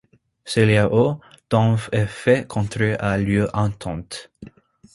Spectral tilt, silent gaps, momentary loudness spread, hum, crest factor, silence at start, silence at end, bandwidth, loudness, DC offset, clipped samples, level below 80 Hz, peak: -6.5 dB/octave; none; 14 LU; none; 18 dB; 0.45 s; 0.45 s; 11.5 kHz; -20 LUFS; under 0.1%; under 0.1%; -44 dBFS; -2 dBFS